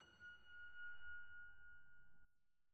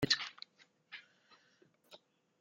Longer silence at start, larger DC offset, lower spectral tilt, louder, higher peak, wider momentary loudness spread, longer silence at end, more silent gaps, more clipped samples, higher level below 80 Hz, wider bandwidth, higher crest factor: about the same, 0 s vs 0 s; neither; second, 0.5 dB/octave vs -3 dB/octave; second, -59 LUFS vs -36 LUFS; second, -44 dBFS vs -16 dBFS; second, 10 LU vs 27 LU; second, 0 s vs 0.45 s; neither; neither; second, -78 dBFS vs -72 dBFS; second, 7.6 kHz vs 16 kHz; second, 12 dB vs 26 dB